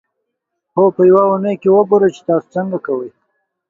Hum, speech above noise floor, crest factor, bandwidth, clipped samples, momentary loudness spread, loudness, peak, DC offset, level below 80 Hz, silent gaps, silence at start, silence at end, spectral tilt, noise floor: none; 62 dB; 14 dB; 7.2 kHz; under 0.1%; 12 LU; -14 LUFS; 0 dBFS; under 0.1%; -62 dBFS; none; 0.75 s; 0.6 s; -9 dB/octave; -75 dBFS